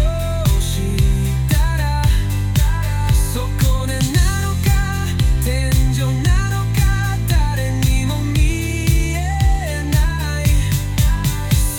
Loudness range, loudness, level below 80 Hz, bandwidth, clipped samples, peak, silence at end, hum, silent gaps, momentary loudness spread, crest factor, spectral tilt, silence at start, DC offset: 1 LU; -18 LUFS; -18 dBFS; 18 kHz; under 0.1%; -4 dBFS; 0 s; none; none; 2 LU; 12 dB; -5 dB/octave; 0 s; under 0.1%